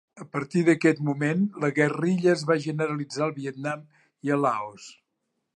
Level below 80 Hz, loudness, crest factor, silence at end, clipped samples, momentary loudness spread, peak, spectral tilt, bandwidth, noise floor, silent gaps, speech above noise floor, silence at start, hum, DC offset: -74 dBFS; -25 LUFS; 18 dB; 0.65 s; under 0.1%; 11 LU; -8 dBFS; -6.5 dB/octave; 11 kHz; -79 dBFS; none; 54 dB; 0.15 s; none; under 0.1%